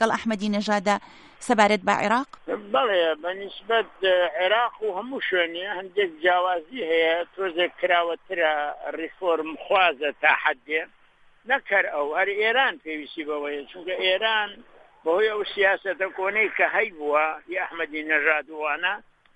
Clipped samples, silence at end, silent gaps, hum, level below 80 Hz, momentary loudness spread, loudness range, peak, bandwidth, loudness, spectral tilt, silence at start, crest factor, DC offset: under 0.1%; 0.35 s; none; none; -66 dBFS; 10 LU; 2 LU; -4 dBFS; 11 kHz; -24 LUFS; -3.5 dB/octave; 0 s; 20 dB; under 0.1%